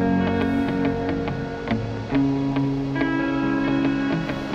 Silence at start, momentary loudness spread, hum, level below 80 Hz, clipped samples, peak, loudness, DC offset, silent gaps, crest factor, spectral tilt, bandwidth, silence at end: 0 s; 5 LU; none; -42 dBFS; under 0.1%; -10 dBFS; -23 LUFS; under 0.1%; none; 14 dB; -8 dB/octave; 7.2 kHz; 0 s